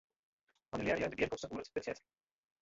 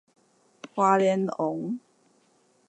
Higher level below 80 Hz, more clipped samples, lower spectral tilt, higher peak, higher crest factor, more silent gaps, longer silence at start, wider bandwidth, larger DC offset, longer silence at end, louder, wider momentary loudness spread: first, -64 dBFS vs -82 dBFS; neither; second, -4 dB/octave vs -6.5 dB/octave; second, -20 dBFS vs -8 dBFS; about the same, 20 dB vs 20 dB; neither; about the same, 0.75 s vs 0.65 s; second, 7.8 kHz vs 9 kHz; neither; second, 0.65 s vs 0.9 s; second, -39 LUFS vs -26 LUFS; second, 10 LU vs 15 LU